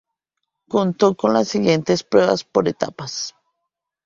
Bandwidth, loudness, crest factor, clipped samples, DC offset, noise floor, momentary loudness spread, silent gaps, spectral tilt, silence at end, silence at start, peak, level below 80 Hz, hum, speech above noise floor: 7.6 kHz; -19 LUFS; 20 dB; under 0.1%; under 0.1%; -79 dBFS; 10 LU; none; -5.5 dB/octave; 0.75 s; 0.7 s; 0 dBFS; -60 dBFS; none; 61 dB